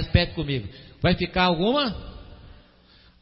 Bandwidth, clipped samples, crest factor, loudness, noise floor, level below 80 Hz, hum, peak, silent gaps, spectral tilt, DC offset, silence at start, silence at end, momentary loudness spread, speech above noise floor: 5.8 kHz; under 0.1%; 20 dB; -24 LUFS; -55 dBFS; -38 dBFS; none; -4 dBFS; none; -10.5 dB/octave; under 0.1%; 0 s; 0.7 s; 20 LU; 31 dB